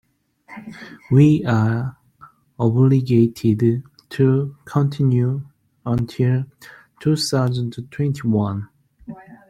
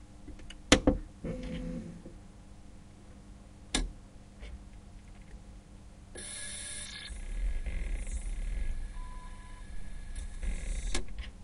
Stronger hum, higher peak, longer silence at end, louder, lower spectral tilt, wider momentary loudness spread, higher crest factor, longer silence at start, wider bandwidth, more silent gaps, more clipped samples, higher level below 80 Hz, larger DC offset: neither; first, -2 dBFS vs -6 dBFS; first, 0.15 s vs 0 s; first, -19 LUFS vs -36 LUFS; first, -7.5 dB/octave vs -3.5 dB/octave; about the same, 21 LU vs 19 LU; second, 18 dB vs 30 dB; first, 0.5 s vs 0 s; about the same, 12.5 kHz vs 11.5 kHz; neither; neither; second, -54 dBFS vs -40 dBFS; neither